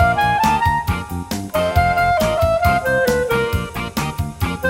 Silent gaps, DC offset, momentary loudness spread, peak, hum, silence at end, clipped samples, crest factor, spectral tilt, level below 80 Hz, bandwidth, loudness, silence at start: none; under 0.1%; 8 LU; -4 dBFS; none; 0 s; under 0.1%; 14 dB; -5.5 dB/octave; -32 dBFS; 16.5 kHz; -18 LUFS; 0 s